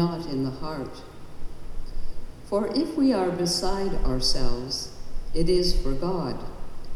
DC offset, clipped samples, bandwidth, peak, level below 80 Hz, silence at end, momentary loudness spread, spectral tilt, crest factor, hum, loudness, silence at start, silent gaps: under 0.1%; under 0.1%; 12.5 kHz; -10 dBFS; -30 dBFS; 0 s; 21 LU; -5 dB/octave; 14 dB; none; -27 LUFS; 0 s; none